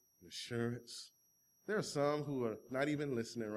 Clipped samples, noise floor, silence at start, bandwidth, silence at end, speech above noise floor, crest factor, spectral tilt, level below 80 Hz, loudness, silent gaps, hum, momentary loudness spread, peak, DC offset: under 0.1%; -74 dBFS; 0.2 s; 15.5 kHz; 0 s; 34 dB; 18 dB; -5.5 dB/octave; -78 dBFS; -40 LUFS; none; none; 14 LU; -22 dBFS; under 0.1%